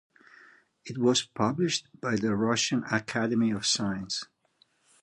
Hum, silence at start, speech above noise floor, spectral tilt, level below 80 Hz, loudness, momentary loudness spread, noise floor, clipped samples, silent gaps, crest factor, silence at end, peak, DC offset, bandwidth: none; 0.85 s; 40 dB; -4 dB/octave; -64 dBFS; -28 LUFS; 9 LU; -68 dBFS; under 0.1%; none; 18 dB; 0.8 s; -12 dBFS; under 0.1%; 11.5 kHz